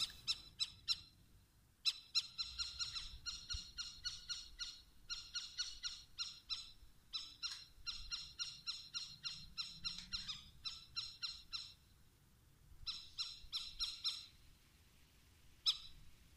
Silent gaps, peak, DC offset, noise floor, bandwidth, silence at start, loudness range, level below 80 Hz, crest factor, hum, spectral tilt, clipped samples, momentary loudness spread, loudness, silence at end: none; -22 dBFS; under 0.1%; -70 dBFS; 15.5 kHz; 0 s; 5 LU; -64 dBFS; 26 dB; none; 0.5 dB/octave; under 0.1%; 9 LU; -44 LUFS; 0 s